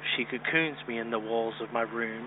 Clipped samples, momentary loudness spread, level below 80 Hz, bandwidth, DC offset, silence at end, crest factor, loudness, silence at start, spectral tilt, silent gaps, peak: under 0.1%; 6 LU; -80 dBFS; 4.1 kHz; under 0.1%; 0 s; 18 dB; -30 LUFS; 0 s; -8.5 dB/octave; none; -14 dBFS